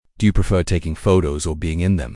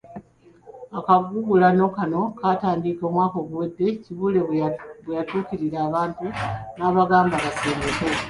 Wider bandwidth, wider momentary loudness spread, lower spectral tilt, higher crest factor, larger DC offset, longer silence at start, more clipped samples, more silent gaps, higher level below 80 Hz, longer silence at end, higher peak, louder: about the same, 12 kHz vs 11.5 kHz; second, 6 LU vs 11 LU; about the same, -6.5 dB/octave vs -6.5 dB/octave; about the same, 16 dB vs 18 dB; neither; first, 0.2 s vs 0.05 s; neither; neither; first, -28 dBFS vs -50 dBFS; about the same, 0 s vs 0 s; about the same, -2 dBFS vs -4 dBFS; about the same, -20 LUFS vs -22 LUFS